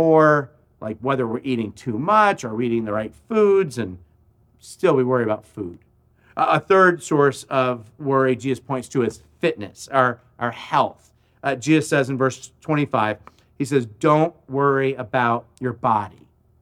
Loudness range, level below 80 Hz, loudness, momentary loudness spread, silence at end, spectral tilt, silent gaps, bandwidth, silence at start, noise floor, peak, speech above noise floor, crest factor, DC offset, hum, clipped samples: 3 LU; -60 dBFS; -21 LUFS; 12 LU; 0.5 s; -6 dB/octave; none; 13.5 kHz; 0 s; -57 dBFS; -2 dBFS; 37 dB; 18 dB; under 0.1%; none; under 0.1%